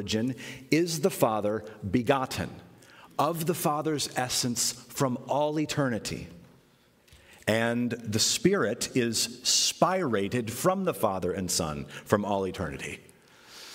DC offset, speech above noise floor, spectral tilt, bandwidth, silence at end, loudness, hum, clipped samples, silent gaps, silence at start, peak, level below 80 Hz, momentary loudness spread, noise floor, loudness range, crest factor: under 0.1%; 34 dB; -3.5 dB/octave; 16 kHz; 0 s; -28 LUFS; none; under 0.1%; none; 0 s; -6 dBFS; -58 dBFS; 11 LU; -62 dBFS; 4 LU; 22 dB